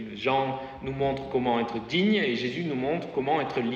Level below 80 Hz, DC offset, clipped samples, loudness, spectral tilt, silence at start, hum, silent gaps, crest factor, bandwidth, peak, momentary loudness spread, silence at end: -56 dBFS; under 0.1%; under 0.1%; -27 LUFS; -6.5 dB/octave; 0 s; none; none; 16 dB; 7.4 kHz; -12 dBFS; 6 LU; 0 s